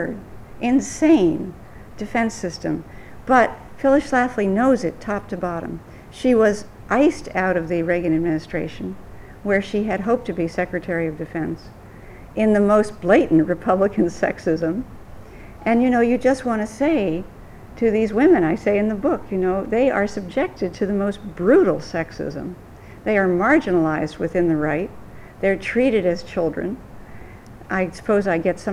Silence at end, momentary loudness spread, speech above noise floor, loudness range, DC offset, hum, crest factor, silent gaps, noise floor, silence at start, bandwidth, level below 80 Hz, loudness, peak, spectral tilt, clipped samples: 0 s; 13 LU; 20 dB; 4 LU; under 0.1%; none; 18 dB; none; -40 dBFS; 0 s; 12 kHz; -44 dBFS; -20 LUFS; -2 dBFS; -6.5 dB/octave; under 0.1%